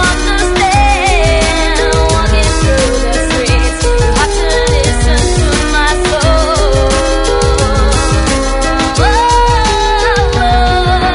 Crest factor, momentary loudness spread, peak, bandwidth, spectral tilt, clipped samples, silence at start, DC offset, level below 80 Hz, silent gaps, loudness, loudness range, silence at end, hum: 10 dB; 3 LU; 0 dBFS; 11 kHz; -4 dB/octave; under 0.1%; 0 s; under 0.1%; -14 dBFS; none; -11 LUFS; 1 LU; 0 s; none